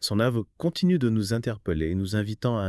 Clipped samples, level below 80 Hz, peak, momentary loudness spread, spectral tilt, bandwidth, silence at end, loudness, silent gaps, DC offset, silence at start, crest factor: under 0.1%; -48 dBFS; -12 dBFS; 5 LU; -6.5 dB/octave; 12 kHz; 0 s; -26 LUFS; none; under 0.1%; 0 s; 14 dB